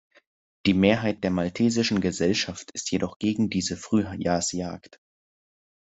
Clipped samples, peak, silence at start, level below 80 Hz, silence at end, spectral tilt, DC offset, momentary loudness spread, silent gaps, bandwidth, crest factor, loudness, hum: under 0.1%; -6 dBFS; 0.65 s; -60 dBFS; 1 s; -5 dB/octave; under 0.1%; 9 LU; 3.16-3.20 s; 8.2 kHz; 20 dB; -25 LUFS; none